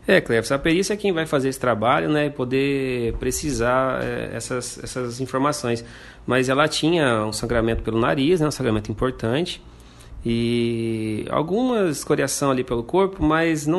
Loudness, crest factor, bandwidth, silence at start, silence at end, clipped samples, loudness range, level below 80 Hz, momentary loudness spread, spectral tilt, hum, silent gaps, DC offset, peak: -22 LUFS; 20 dB; 12.5 kHz; 0 s; 0 s; under 0.1%; 3 LU; -40 dBFS; 8 LU; -5 dB/octave; none; none; under 0.1%; -2 dBFS